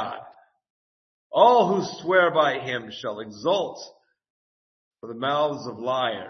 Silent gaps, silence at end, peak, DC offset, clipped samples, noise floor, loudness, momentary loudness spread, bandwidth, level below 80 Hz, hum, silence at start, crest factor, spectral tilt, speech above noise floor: 0.70-1.30 s, 4.30-4.91 s; 0 s; -4 dBFS; under 0.1%; under 0.1%; -50 dBFS; -23 LUFS; 16 LU; 6.4 kHz; -74 dBFS; none; 0 s; 22 dB; -5 dB/octave; 27 dB